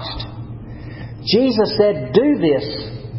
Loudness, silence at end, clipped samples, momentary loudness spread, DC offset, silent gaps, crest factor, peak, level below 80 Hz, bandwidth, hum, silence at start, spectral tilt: -17 LUFS; 0 s; under 0.1%; 18 LU; under 0.1%; none; 18 dB; 0 dBFS; -40 dBFS; 5.8 kHz; none; 0 s; -10 dB/octave